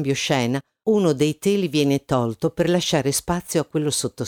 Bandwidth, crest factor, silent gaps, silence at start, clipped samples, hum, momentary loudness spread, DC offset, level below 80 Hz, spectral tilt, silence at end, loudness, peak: 19 kHz; 14 dB; none; 0 s; under 0.1%; none; 4 LU; under 0.1%; -50 dBFS; -5 dB/octave; 0 s; -21 LUFS; -6 dBFS